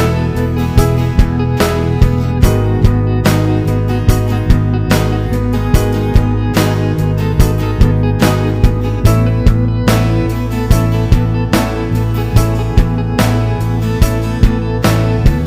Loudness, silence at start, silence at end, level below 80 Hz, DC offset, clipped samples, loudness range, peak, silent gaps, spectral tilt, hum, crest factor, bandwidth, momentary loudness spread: -13 LUFS; 0 s; 0 s; -18 dBFS; under 0.1%; 1%; 1 LU; 0 dBFS; none; -7 dB/octave; none; 12 dB; 16 kHz; 3 LU